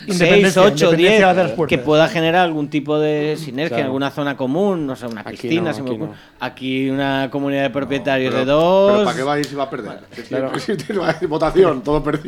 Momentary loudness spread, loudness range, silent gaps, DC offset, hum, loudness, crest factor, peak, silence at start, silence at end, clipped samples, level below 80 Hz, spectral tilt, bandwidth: 13 LU; 7 LU; none; under 0.1%; none; -17 LUFS; 16 dB; -2 dBFS; 0 s; 0 s; under 0.1%; -44 dBFS; -5.5 dB/octave; 15.5 kHz